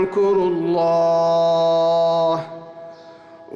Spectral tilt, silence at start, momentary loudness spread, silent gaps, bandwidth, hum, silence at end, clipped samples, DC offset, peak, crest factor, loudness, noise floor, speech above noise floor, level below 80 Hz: -6.5 dB/octave; 0 s; 18 LU; none; 7.2 kHz; none; 0 s; under 0.1%; under 0.1%; -10 dBFS; 8 dB; -18 LUFS; -42 dBFS; 25 dB; -60 dBFS